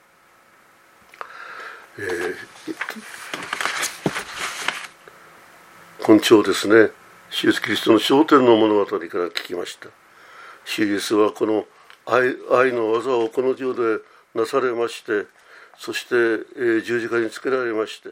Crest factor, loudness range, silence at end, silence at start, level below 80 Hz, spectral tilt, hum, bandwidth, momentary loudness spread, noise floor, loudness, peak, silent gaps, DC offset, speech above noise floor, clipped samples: 22 dB; 11 LU; 0 s; 1.2 s; -68 dBFS; -4 dB/octave; none; 16 kHz; 19 LU; -54 dBFS; -20 LUFS; 0 dBFS; none; under 0.1%; 35 dB; under 0.1%